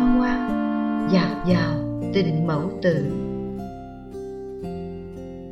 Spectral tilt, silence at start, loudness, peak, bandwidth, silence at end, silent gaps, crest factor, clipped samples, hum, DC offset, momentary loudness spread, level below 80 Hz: -8 dB/octave; 0 s; -24 LUFS; -8 dBFS; 8 kHz; 0 s; none; 16 dB; under 0.1%; none; under 0.1%; 15 LU; -40 dBFS